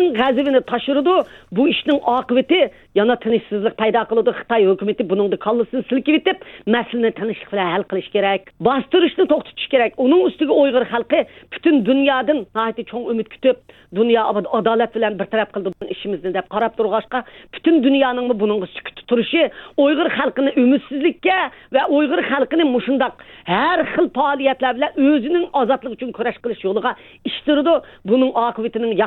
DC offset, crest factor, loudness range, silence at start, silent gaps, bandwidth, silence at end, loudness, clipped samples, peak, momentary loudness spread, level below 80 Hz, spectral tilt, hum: under 0.1%; 16 dB; 3 LU; 0 s; none; 4.3 kHz; 0 s; -18 LUFS; under 0.1%; -2 dBFS; 8 LU; -56 dBFS; -8 dB/octave; none